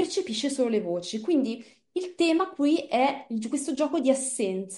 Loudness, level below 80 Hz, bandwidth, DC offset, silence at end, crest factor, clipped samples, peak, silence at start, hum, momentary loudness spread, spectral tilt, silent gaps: -27 LUFS; -76 dBFS; 11.5 kHz; under 0.1%; 0 s; 18 dB; under 0.1%; -10 dBFS; 0 s; none; 8 LU; -3.5 dB/octave; none